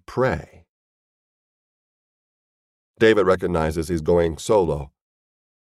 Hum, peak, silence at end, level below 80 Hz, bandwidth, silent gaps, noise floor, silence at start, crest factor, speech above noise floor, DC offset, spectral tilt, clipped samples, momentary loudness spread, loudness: none; -4 dBFS; 0.8 s; -42 dBFS; 13.5 kHz; 0.69-2.94 s; under -90 dBFS; 0.1 s; 20 dB; over 70 dB; under 0.1%; -6 dB/octave; under 0.1%; 11 LU; -21 LUFS